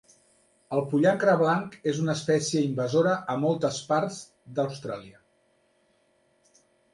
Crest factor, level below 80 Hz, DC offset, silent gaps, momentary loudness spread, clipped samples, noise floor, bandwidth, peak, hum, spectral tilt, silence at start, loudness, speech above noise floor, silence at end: 20 dB; -70 dBFS; under 0.1%; none; 13 LU; under 0.1%; -67 dBFS; 11.5 kHz; -8 dBFS; none; -5.5 dB/octave; 0.7 s; -26 LUFS; 42 dB; 1.8 s